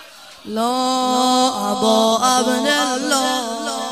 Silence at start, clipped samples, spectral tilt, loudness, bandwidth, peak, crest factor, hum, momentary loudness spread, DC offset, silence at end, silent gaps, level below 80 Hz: 0 s; under 0.1%; -2 dB/octave; -17 LUFS; 15.5 kHz; -2 dBFS; 16 dB; none; 8 LU; 0.1%; 0 s; none; -62 dBFS